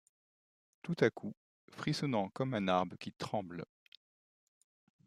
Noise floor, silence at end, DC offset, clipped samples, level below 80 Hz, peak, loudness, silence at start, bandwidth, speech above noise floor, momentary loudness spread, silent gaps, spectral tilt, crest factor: under -90 dBFS; 1.45 s; under 0.1%; under 0.1%; -76 dBFS; -14 dBFS; -36 LUFS; 0.85 s; 14 kHz; over 54 dB; 15 LU; 1.37-1.68 s; -6 dB/octave; 24 dB